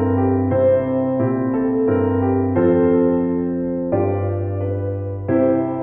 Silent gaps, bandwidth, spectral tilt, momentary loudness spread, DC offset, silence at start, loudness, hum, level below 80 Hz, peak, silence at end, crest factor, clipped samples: none; 3.4 kHz; -14 dB/octave; 7 LU; under 0.1%; 0 s; -19 LUFS; none; -48 dBFS; -6 dBFS; 0 s; 12 dB; under 0.1%